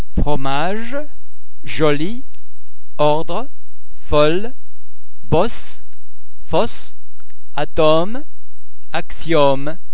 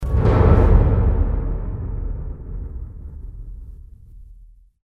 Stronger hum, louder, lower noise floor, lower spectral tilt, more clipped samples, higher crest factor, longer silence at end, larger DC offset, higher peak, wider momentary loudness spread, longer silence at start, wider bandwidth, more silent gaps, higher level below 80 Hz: neither; about the same, -19 LUFS vs -19 LUFS; first, -53 dBFS vs -46 dBFS; second, -9 dB/octave vs -10.5 dB/octave; neither; about the same, 22 dB vs 18 dB; second, 0.15 s vs 0.4 s; first, 40% vs under 0.1%; about the same, 0 dBFS vs -2 dBFS; second, 17 LU vs 23 LU; about the same, 0.1 s vs 0 s; second, 4 kHz vs 4.5 kHz; neither; second, -34 dBFS vs -22 dBFS